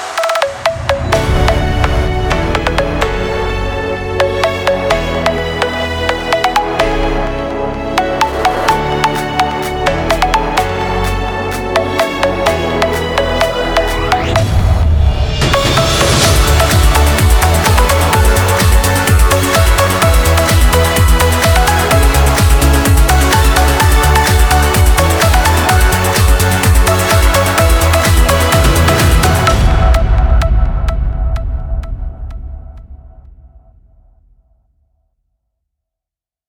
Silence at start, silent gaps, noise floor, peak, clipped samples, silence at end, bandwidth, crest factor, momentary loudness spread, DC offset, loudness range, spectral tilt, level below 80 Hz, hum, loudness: 0 s; none; -87 dBFS; 0 dBFS; under 0.1%; 3.2 s; over 20 kHz; 12 dB; 7 LU; under 0.1%; 5 LU; -4.5 dB/octave; -16 dBFS; none; -12 LUFS